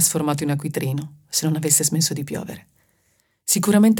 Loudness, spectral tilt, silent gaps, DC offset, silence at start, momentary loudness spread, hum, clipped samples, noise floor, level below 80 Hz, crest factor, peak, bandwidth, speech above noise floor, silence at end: -21 LUFS; -4 dB/octave; none; under 0.1%; 0 s; 15 LU; none; under 0.1%; -66 dBFS; -62 dBFS; 20 dB; 0 dBFS; 18.5 kHz; 45 dB; 0 s